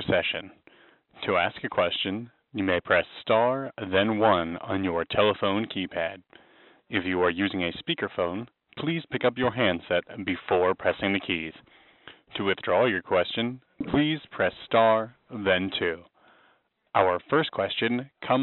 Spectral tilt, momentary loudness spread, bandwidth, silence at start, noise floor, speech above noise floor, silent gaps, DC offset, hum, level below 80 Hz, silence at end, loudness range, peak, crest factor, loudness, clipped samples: -3 dB/octave; 9 LU; 4.2 kHz; 0 s; -66 dBFS; 40 dB; none; under 0.1%; none; -60 dBFS; 0 s; 3 LU; -6 dBFS; 22 dB; -26 LUFS; under 0.1%